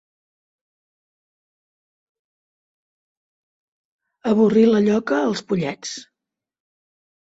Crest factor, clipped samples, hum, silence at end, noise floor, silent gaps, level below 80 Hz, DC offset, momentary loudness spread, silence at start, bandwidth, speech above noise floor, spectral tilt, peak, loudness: 20 dB; under 0.1%; none; 1.25 s; under -90 dBFS; none; -64 dBFS; under 0.1%; 16 LU; 4.25 s; 8 kHz; over 72 dB; -6 dB/octave; -4 dBFS; -19 LUFS